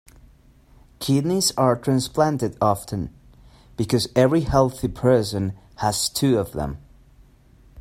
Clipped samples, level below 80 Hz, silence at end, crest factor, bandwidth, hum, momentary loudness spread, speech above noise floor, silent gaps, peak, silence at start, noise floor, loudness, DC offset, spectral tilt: under 0.1%; -44 dBFS; 0 s; 20 dB; 16 kHz; none; 12 LU; 31 dB; none; -4 dBFS; 1 s; -52 dBFS; -22 LUFS; under 0.1%; -5.5 dB/octave